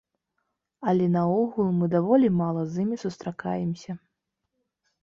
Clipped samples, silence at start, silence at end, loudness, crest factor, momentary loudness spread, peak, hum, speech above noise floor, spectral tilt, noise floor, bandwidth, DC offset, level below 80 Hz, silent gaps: under 0.1%; 0.8 s; 1.05 s; -25 LUFS; 18 dB; 13 LU; -8 dBFS; none; 57 dB; -9 dB/octave; -81 dBFS; 7.2 kHz; under 0.1%; -64 dBFS; none